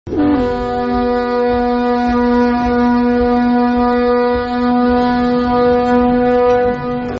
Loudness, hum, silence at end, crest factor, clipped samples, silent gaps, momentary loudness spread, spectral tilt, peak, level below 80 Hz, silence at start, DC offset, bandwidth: -14 LUFS; none; 0 s; 10 dB; under 0.1%; none; 4 LU; -5 dB/octave; -2 dBFS; -32 dBFS; 0.05 s; under 0.1%; 6.2 kHz